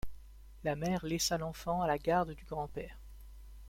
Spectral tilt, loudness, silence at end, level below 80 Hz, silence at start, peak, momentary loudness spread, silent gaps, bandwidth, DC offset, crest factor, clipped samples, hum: -4.5 dB/octave; -35 LUFS; 0 s; -52 dBFS; 0.05 s; -18 dBFS; 22 LU; none; 16.5 kHz; under 0.1%; 18 dB; under 0.1%; none